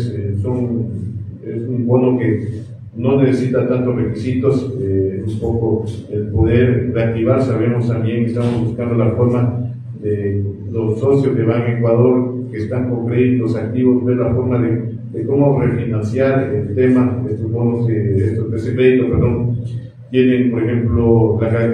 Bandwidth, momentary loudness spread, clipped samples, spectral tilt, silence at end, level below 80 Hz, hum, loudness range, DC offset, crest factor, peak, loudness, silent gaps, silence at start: 9 kHz; 9 LU; under 0.1%; -10 dB/octave; 0 s; -38 dBFS; none; 2 LU; under 0.1%; 14 dB; -2 dBFS; -16 LUFS; none; 0 s